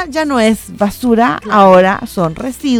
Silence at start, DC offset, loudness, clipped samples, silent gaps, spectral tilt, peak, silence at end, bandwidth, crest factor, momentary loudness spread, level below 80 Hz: 0 s; under 0.1%; -12 LUFS; 0.2%; none; -5.5 dB/octave; 0 dBFS; 0 s; 17 kHz; 12 dB; 11 LU; -40 dBFS